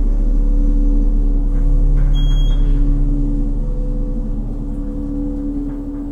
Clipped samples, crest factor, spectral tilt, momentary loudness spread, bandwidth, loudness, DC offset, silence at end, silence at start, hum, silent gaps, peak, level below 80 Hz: under 0.1%; 10 dB; -8.5 dB/octave; 7 LU; 3.5 kHz; -20 LUFS; under 0.1%; 0 s; 0 s; none; none; -4 dBFS; -14 dBFS